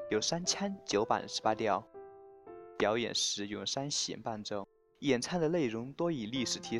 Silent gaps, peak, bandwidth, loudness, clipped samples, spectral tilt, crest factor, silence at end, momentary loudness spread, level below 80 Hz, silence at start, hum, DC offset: none; -14 dBFS; 12.5 kHz; -34 LUFS; under 0.1%; -3.5 dB/octave; 20 dB; 0 s; 17 LU; -68 dBFS; 0 s; none; under 0.1%